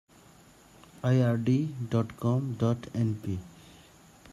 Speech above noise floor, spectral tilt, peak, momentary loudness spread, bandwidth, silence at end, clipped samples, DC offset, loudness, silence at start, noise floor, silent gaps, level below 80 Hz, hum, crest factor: 29 dB; -8.5 dB/octave; -12 dBFS; 10 LU; 12.5 kHz; 0 s; under 0.1%; under 0.1%; -29 LUFS; 1.05 s; -56 dBFS; none; -62 dBFS; none; 18 dB